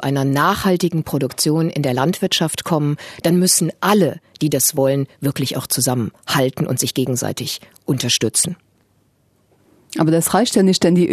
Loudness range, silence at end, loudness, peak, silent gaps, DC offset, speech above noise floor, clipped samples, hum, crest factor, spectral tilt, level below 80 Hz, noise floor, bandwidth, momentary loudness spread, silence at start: 3 LU; 0 s; -17 LUFS; -2 dBFS; none; under 0.1%; 42 dB; under 0.1%; none; 16 dB; -4.5 dB/octave; -52 dBFS; -60 dBFS; 14 kHz; 8 LU; 0 s